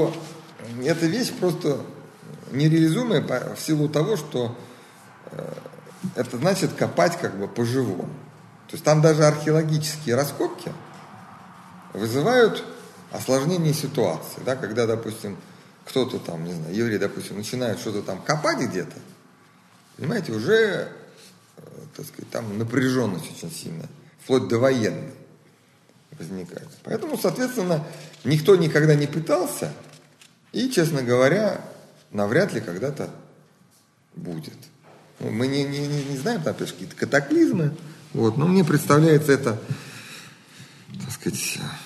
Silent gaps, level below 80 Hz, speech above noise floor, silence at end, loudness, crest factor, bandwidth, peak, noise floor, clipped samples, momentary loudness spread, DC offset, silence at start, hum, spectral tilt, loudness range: none; -66 dBFS; 36 dB; 0 s; -23 LUFS; 22 dB; 13 kHz; -2 dBFS; -59 dBFS; under 0.1%; 21 LU; under 0.1%; 0 s; none; -5.5 dB/octave; 7 LU